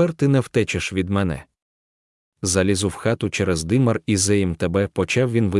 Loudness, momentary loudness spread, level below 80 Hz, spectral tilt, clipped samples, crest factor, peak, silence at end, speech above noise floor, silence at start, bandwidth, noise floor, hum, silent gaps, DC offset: -21 LUFS; 5 LU; -50 dBFS; -5 dB/octave; under 0.1%; 16 dB; -6 dBFS; 0 s; over 70 dB; 0 s; 12 kHz; under -90 dBFS; none; 1.62-2.32 s; under 0.1%